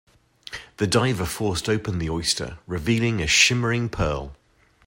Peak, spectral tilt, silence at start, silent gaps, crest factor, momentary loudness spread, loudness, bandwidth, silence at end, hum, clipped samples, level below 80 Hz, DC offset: -4 dBFS; -4 dB/octave; 0.5 s; none; 20 dB; 15 LU; -22 LUFS; 16.5 kHz; 0.5 s; none; under 0.1%; -42 dBFS; under 0.1%